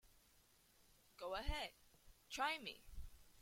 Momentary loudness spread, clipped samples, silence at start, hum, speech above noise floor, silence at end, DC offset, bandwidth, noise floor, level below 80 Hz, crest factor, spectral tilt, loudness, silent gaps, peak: 19 LU; under 0.1%; 0.05 s; none; 28 dB; 0 s; under 0.1%; 16.5 kHz; -73 dBFS; -56 dBFS; 20 dB; -3 dB/octave; -47 LUFS; none; -30 dBFS